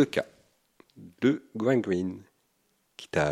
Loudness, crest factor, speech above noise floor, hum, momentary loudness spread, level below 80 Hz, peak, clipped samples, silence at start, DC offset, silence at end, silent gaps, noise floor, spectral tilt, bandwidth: -29 LUFS; 20 dB; 45 dB; none; 18 LU; -62 dBFS; -10 dBFS; under 0.1%; 0 s; under 0.1%; 0 s; none; -72 dBFS; -6.5 dB/octave; 13.5 kHz